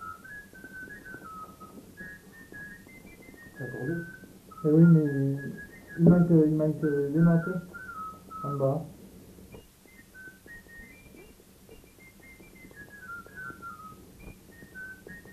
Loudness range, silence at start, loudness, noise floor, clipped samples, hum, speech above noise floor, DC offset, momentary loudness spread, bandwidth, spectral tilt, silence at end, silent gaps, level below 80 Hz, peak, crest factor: 22 LU; 0 s; -25 LUFS; -55 dBFS; under 0.1%; none; 31 dB; under 0.1%; 28 LU; 14 kHz; -9.5 dB/octave; 0 s; none; -58 dBFS; -8 dBFS; 22 dB